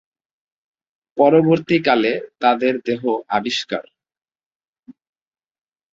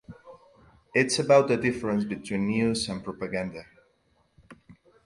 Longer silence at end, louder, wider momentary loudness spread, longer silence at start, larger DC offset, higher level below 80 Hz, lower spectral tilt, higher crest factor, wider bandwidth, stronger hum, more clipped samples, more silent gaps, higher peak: first, 1 s vs 0.35 s; first, -18 LUFS vs -26 LUFS; second, 9 LU vs 13 LU; first, 1.15 s vs 0.1 s; neither; about the same, -62 dBFS vs -58 dBFS; about the same, -6 dB/octave vs -5 dB/octave; about the same, 18 dB vs 20 dB; second, 7.8 kHz vs 11.5 kHz; neither; neither; first, 4.46-4.60 s, 4.68-4.73 s vs none; first, -2 dBFS vs -8 dBFS